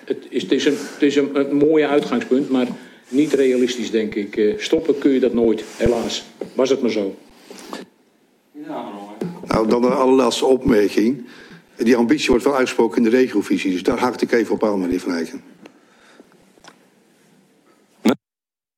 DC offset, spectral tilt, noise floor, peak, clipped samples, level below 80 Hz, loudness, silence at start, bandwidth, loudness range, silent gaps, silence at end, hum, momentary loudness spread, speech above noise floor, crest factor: under 0.1%; -5 dB/octave; under -90 dBFS; -2 dBFS; under 0.1%; -48 dBFS; -18 LUFS; 0.05 s; 16.5 kHz; 8 LU; none; 0.6 s; none; 15 LU; over 72 dB; 16 dB